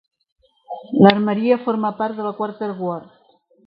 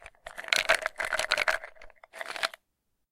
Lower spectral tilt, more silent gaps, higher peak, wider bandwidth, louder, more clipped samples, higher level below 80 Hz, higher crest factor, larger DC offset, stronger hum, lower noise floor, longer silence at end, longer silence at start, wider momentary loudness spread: first, -10 dB/octave vs 0.5 dB/octave; neither; first, 0 dBFS vs -6 dBFS; second, 5.4 kHz vs 17 kHz; first, -19 LUFS vs -28 LUFS; neither; about the same, -62 dBFS vs -58 dBFS; second, 20 dB vs 26 dB; neither; neither; second, -57 dBFS vs -79 dBFS; about the same, 0.65 s vs 0.6 s; first, 0.7 s vs 0 s; about the same, 17 LU vs 19 LU